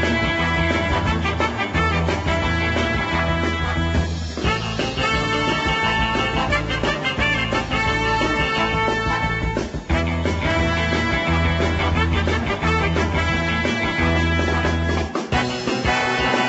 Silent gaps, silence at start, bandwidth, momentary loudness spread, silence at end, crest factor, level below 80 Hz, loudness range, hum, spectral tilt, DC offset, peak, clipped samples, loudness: none; 0 s; 8.2 kHz; 3 LU; 0 s; 14 dB; -30 dBFS; 1 LU; none; -5.5 dB/octave; under 0.1%; -6 dBFS; under 0.1%; -20 LUFS